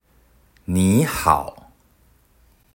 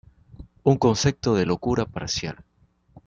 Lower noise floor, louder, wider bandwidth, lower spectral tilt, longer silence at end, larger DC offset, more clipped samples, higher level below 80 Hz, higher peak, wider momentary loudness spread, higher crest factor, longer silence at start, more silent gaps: about the same, -57 dBFS vs -57 dBFS; first, -19 LUFS vs -23 LUFS; first, 16.5 kHz vs 7.6 kHz; about the same, -5.5 dB/octave vs -5.5 dB/octave; first, 1.25 s vs 0.7 s; neither; neither; about the same, -46 dBFS vs -48 dBFS; first, 0 dBFS vs -6 dBFS; first, 17 LU vs 9 LU; about the same, 22 dB vs 20 dB; first, 0.7 s vs 0.4 s; neither